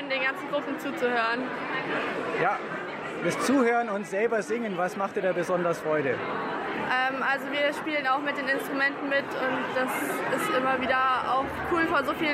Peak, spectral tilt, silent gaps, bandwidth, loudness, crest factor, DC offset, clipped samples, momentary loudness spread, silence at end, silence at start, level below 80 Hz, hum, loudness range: -12 dBFS; -4.5 dB/octave; none; 16 kHz; -27 LUFS; 16 dB; under 0.1%; under 0.1%; 6 LU; 0 s; 0 s; -62 dBFS; none; 2 LU